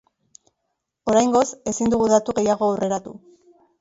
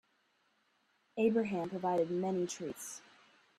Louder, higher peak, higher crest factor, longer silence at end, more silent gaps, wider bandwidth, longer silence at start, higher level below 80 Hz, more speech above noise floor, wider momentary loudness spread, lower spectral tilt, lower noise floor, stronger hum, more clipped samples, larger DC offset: first, -20 LUFS vs -35 LUFS; first, -4 dBFS vs -20 dBFS; about the same, 18 dB vs 18 dB; about the same, 0.65 s vs 0.6 s; neither; second, 8 kHz vs 14.5 kHz; about the same, 1.05 s vs 1.15 s; first, -54 dBFS vs -80 dBFS; first, 58 dB vs 41 dB; second, 10 LU vs 14 LU; about the same, -5 dB/octave vs -5.5 dB/octave; about the same, -77 dBFS vs -75 dBFS; neither; neither; neither